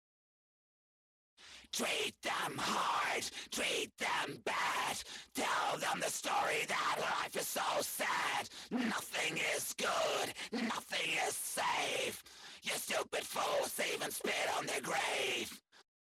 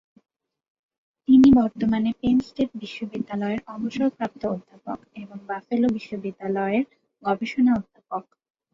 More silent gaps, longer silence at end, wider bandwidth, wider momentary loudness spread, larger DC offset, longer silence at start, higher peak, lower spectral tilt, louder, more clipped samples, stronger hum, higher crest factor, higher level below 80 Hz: neither; second, 0.25 s vs 0.5 s; first, 16.5 kHz vs 7.2 kHz; second, 5 LU vs 17 LU; neither; about the same, 1.4 s vs 1.3 s; second, -24 dBFS vs -8 dBFS; second, -1.5 dB/octave vs -7.5 dB/octave; second, -36 LUFS vs -23 LUFS; neither; neither; about the same, 14 dB vs 16 dB; second, -76 dBFS vs -52 dBFS